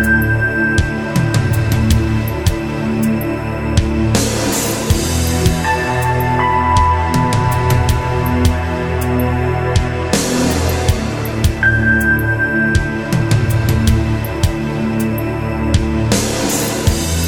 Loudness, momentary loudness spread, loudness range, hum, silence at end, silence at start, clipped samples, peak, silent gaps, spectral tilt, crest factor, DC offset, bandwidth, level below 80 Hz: -15 LUFS; 5 LU; 2 LU; none; 0 s; 0 s; under 0.1%; 0 dBFS; none; -5 dB/octave; 14 dB; under 0.1%; 18 kHz; -24 dBFS